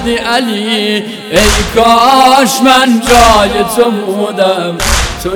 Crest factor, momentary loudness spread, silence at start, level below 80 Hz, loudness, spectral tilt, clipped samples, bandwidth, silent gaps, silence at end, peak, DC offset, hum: 8 dB; 8 LU; 0 s; -22 dBFS; -8 LUFS; -3.5 dB/octave; 2%; over 20 kHz; none; 0 s; 0 dBFS; under 0.1%; none